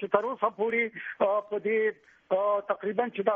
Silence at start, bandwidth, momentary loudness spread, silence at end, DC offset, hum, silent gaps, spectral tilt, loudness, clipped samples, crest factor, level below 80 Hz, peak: 0 s; 3.7 kHz; 4 LU; 0 s; under 0.1%; none; none; -3.5 dB/octave; -29 LUFS; under 0.1%; 20 dB; -76 dBFS; -8 dBFS